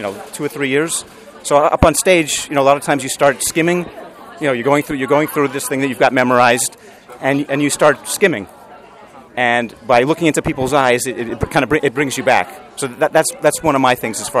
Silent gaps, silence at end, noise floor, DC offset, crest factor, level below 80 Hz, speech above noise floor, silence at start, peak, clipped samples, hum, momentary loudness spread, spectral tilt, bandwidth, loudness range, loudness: none; 0 s; -40 dBFS; under 0.1%; 16 dB; -40 dBFS; 25 dB; 0 s; 0 dBFS; under 0.1%; none; 10 LU; -4 dB/octave; 15.5 kHz; 2 LU; -15 LUFS